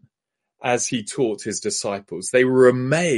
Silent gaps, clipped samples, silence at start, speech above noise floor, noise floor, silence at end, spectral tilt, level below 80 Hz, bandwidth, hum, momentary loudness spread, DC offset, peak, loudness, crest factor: none; under 0.1%; 0.6 s; 64 dB; -83 dBFS; 0 s; -4.5 dB/octave; -64 dBFS; 11.5 kHz; none; 12 LU; under 0.1%; -2 dBFS; -20 LUFS; 18 dB